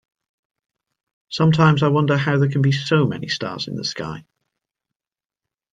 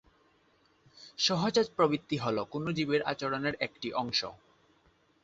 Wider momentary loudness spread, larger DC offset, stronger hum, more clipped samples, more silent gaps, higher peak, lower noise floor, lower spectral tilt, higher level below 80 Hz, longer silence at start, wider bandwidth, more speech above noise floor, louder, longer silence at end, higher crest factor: first, 14 LU vs 7 LU; neither; neither; neither; neither; first, -2 dBFS vs -12 dBFS; first, under -90 dBFS vs -68 dBFS; first, -6.5 dB/octave vs -4.5 dB/octave; first, -58 dBFS vs -68 dBFS; first, 1.3 s vs 0.95 s; about the same, 7.6 kHz vs 8 kHz; first, over 72 dB vs 37 dB; first, -19 LUFS vs -31 LUFS; first, 1.5 s vs 0.9 s; about the same, 18 dB vs 20 dB